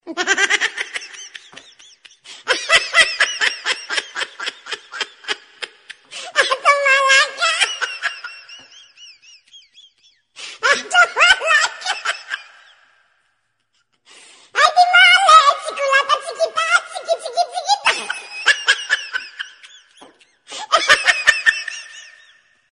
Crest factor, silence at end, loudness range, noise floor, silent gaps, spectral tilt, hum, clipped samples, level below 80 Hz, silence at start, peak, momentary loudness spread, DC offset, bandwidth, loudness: 18 dB; 0.7 s; 8 LU; -68 dBFS; none; 1.5 dB/octave; none; under 0.1%; -60 dBFS; 0.05 s; 0 dBFS; 21 LU; under 0.1%; 10.5 kHz; -15 LUFS